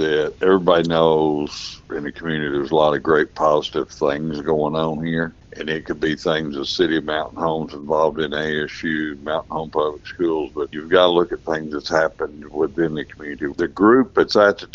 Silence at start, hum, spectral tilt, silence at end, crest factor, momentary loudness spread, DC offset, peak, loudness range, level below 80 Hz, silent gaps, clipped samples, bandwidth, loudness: 0 s; none; -5.5 dB/octave; 0.1 s; 20 dB; 12 LU; under 0.1%; 0 dBFS; 4 LU; -48 dBFS; none; under 0.1%; 7.6 kHz; -20 LUFS